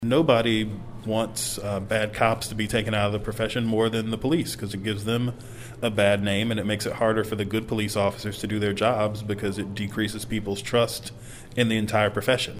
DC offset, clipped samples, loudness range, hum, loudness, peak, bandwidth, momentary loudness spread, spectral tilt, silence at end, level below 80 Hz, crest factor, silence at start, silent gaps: under 0.1%; under 0.1%; 2 LU; none; -25 LUFS; -4 dBFS; 16 kHz; 8 LU; -5 dB/octave; 0 s; -48 dBFS; 20 dB; 0 s; none